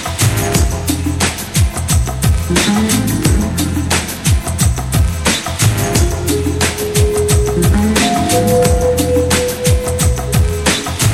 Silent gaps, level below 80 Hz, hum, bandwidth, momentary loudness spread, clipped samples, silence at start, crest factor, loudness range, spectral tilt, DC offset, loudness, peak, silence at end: none; -20 dBFS; none; 17 kHz; 3 LU; under 0.1%; 0 s; 14 dB; 2 LU; -4.5 dB/octave; under 0.1%; -14 LUFS; 0 dBFS; 0 s